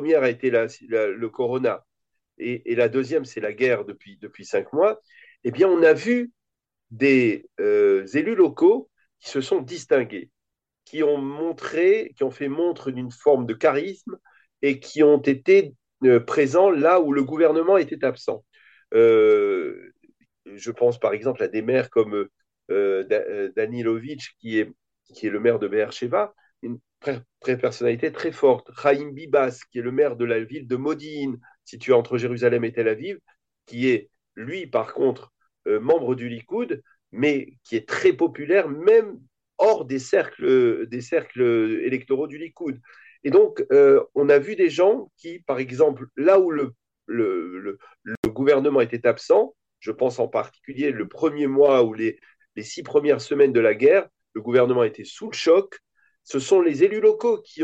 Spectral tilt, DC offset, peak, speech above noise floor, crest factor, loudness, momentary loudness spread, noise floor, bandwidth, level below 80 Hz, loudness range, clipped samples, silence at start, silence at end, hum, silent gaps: -6 dB/octave; under 0.1%; -6 dBFS; 65 dB; 16 dB; -21 LUFS; 16 LU; -86 dBFS; 8.2 kHz; -68 dBFS; 6 LU; under 0.1%; 0 s; 0 s; none; 48.17-48.23 s